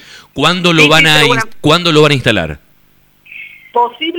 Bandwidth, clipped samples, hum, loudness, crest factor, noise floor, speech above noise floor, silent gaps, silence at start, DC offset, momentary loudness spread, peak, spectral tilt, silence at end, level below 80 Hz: 19 kHz; 0.1%; 50 Hz at -35 dBFS; -9 LUFS; 12 dB; -51 dBFS; 41 dB; none; 0.15 s; under 0.1%; 21 LU; 0 dBFS; -4 dB/octave; 0 s; -42 dBFS